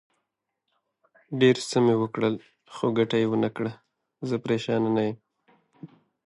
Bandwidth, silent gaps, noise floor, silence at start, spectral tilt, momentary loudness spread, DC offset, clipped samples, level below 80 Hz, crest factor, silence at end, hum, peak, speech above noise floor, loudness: 11.5 kHz; none; -82 dBFS; 1.3 s; -6 dB/octave; 15 LU; under 0.1%; under 0.1%; -70 dBFS; 18 dB; 0.4 s; none; -8 dBFS; 57 dB; -25 LUFS